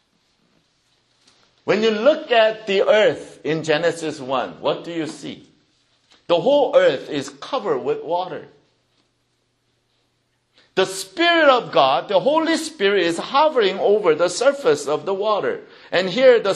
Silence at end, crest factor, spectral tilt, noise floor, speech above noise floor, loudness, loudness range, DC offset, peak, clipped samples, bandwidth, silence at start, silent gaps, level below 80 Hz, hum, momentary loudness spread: 0 s; 20 dB; -4 dB/octave; -68 dBFS; 49 dB; -19 LUFS; 9 LU; under 0.1%; 0 dBFS; under 0.1%; 12 kHz; 1.65 s; none; -70 dBFS; none; 13 LU